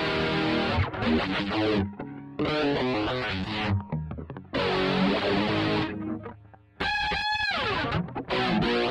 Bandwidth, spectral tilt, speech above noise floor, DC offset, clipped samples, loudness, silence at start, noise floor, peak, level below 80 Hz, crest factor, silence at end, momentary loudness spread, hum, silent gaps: 10.5 kHz; -6.5 dB/octave; 24 dB; under 0.1%; under 0.1%; -27 LUFS; 0 s; -50 dBFS; -14 dBFS; -46 dBFS; 14 dB; 0 s; 10 LU; none; none